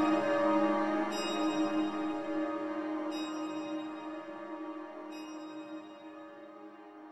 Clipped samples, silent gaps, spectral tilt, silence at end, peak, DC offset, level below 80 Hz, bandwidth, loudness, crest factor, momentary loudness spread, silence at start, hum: under 0.1%; none; -4.5 dB/octave; 0 s; -16 dBFS; under 0.1%; -76 dBFS; 12 kHz; -35 LUFS; 18 dB; 20 LU; 0 s; none